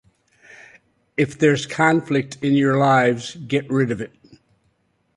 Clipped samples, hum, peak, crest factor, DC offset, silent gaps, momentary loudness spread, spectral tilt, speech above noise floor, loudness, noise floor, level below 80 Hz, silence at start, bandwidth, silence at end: under 0.1%; none; -4 dBFS; 18 dB; under 0.1%; none; 11 LU; -6 dB/octave; 47 dB; -19 LUFS; -66 dBFS; -60 dBFS; 1.2 s; 11.5 kHz; 1.1 s